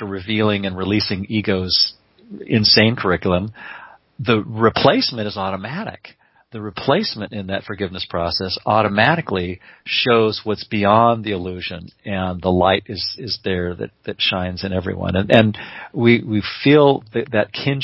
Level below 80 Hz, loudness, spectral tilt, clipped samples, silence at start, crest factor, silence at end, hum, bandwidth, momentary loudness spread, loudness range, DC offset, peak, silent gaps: -42 dBFS; -18 LUFS; -8 dB/octave; under 0.1%; 0 s; 18 dB; 0 s; none; 6 kHz; 15 LU; 4 LU; under 0.1%; 0 dBFS; none